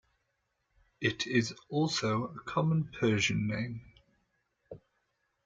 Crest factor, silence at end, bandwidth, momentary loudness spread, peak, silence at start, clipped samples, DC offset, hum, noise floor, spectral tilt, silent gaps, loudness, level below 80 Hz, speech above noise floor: 18 dB; 0.7 s; 9.2 kHz; 6 LU; -16 dBFS; 1 s; under 0.1%; under 0.1%; none; -80 dBFS; -5 dB/octave; none; -32 LUFS; -64 dBFS; 49 dB